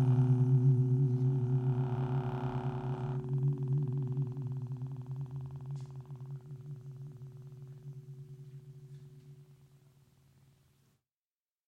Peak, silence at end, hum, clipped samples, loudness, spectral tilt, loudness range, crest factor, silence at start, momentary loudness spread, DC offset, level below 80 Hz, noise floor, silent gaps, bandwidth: -18 dBFS; 2.15 s; none; under 0.1%; -33 LUFS; -10.5 dB/octave; 21 LU; 16 dB; 0 s; 22 LU; under 0.1%; -62 dBFS; under -90 dBFS; none; 3.5 kHz